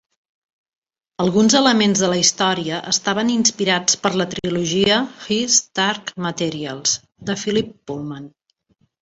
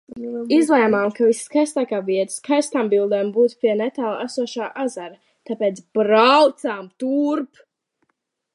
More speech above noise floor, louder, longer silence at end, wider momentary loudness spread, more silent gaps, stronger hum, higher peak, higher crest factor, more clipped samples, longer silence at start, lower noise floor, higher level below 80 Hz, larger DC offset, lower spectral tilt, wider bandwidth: second, 45 dB vs 54 dB; about the same, -18 LUFS vs -19 LUFS; second, 0.75 s vs 1.1 s; about the same, 11 LU vs 12 LU; neither; neither; about the same, -2 dBFS vs -2 dBFS; about the same, 18 dB vs 18 dB; neither; first, 1.2 s vs 0.15 s; second, -64 dBFS vs -74 dBFS; first, -56 dBFS vs -72 dBFS; neither; second, -3 dB/octave vs -4.5 dB/octave; second, 8.2 kHz vs 11.5 kHz